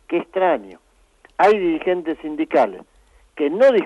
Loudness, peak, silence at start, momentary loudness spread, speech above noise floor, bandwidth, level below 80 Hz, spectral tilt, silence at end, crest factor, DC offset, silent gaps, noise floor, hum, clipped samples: -19 LUFS; -4 dBFS; 0.1 s; 10 LU; 36 dB; 10 kHz; -56 dBFS; -6 dB/octave; 0 s; 16 dB; under 0.1%; none; -54 dBFS; none; under 0.1%